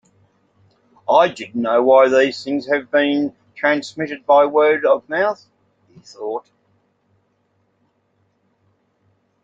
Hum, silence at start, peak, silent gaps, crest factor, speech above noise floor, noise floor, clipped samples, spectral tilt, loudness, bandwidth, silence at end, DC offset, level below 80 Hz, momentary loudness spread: none; 1.1 s; -2 dBFS; none; 18 dB; 48 dB; -65 dBFS; under 0.1%; -5 dB/octave; -17 LUFS; 7.8 kHz; 3.05 s; under 0.1%; -68 dBFS; 15 LU